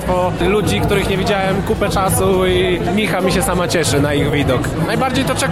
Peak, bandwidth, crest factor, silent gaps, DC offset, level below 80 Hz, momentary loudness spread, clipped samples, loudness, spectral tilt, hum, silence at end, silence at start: -4 dBFS; 16 kHz; 12 dB; none; 0.7%; -30 dBFS; 3 LU; under 0.1%; -16 LUFS; -5 dB/octave; none; 0 s; 0 s